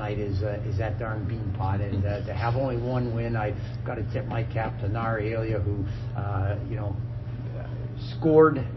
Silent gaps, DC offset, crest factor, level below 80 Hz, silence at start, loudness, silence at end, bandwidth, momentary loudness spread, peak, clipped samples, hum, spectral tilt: none; under 0.1%; 20 dB; -40 dBFS; 0 s; -28 LUFS; 0 s; 6 kHz; 8 LU; -6 dBFS; under 0.1%; none; -10 dB/octave